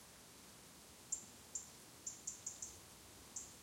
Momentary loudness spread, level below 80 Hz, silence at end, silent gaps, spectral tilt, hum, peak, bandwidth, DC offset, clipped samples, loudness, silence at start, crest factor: 12 LU; -76 dBFS; 0 s; none; -1 dB/octave; none; -30 dBFS; 16.5 kHz; under 0.1%; under 0.1%; -50 LUFS; 0 s; 24 dB